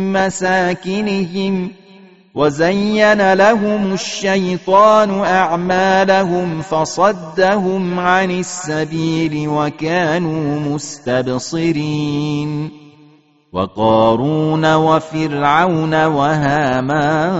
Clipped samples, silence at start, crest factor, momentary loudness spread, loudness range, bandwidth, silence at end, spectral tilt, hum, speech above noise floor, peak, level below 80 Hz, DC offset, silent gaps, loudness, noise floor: under 0.1%; 0 s; 16 dB; 8 LU; 5 LU; 8 kHz; 0 s; -4.5 dB/octave; none; 34 dB; 0 dBFS; -50 dBFS; 0.3%; none; -15 LUFS; -49 dBFS